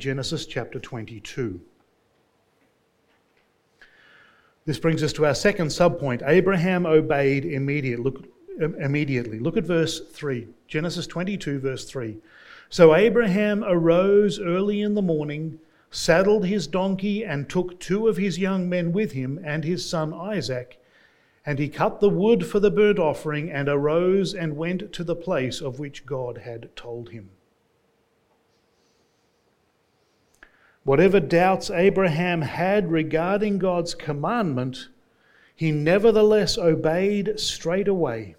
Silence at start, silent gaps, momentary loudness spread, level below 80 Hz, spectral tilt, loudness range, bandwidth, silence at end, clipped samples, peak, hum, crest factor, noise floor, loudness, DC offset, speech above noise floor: 0 s; none; 14 LU; -50 dBFS; -6 dB/octave; 11 LU; 15.5 kHz; 0.05 s; under 0.1%; -2 dBFS; none; 22 dB; -66 dBFS; -23 LUFS; under 0.1%; 44 dB